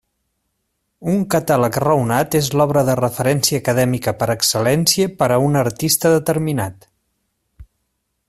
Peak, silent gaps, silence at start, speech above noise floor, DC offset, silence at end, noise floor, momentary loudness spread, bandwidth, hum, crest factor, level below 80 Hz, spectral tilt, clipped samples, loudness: 0 dBFS; none; 1 s; 55 dB; under 0.1%; 0.65 s; -72 dBFS; 5 LU; 16 kHz; none; 18 dB; -50 dBFS; -4.5 dB/octave; under 0.1%; -17 LUFS